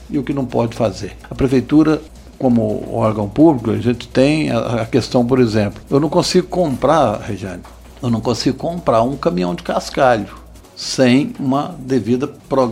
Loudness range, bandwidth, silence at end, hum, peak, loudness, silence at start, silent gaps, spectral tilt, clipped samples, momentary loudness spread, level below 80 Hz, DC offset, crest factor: 3 LU; 15.5 kHz; 0 s; none; 0 dBFS; -17 LUFS; 0 s; none; -6.5 dB/octave; under 0.1%; 8 LU; -40 dBFS; under 0.1%; 16 dB